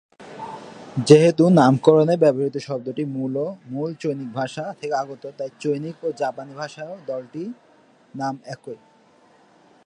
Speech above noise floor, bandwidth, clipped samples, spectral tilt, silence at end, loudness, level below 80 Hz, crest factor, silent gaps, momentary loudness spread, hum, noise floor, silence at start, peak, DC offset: 35 dB; 10 kHz; under 0.1%; -7 dB/octave; 1.1 s; -21 LUFS; -68 dBFS; 22 dB; none; 21 LU; none; -55 dBFS; 0.2 s; 0 dBFS; under 0.1%